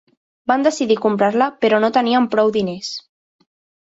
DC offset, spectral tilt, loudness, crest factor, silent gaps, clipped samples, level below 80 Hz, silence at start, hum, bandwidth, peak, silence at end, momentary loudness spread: under 0.1%; -5 dB/octave; -17 LUFS; 16 dB; none; under 0.1%; -62 dBFS; 0.5 s; none; 8 kHz; -2 dBFS; 0.8 s; 12 LU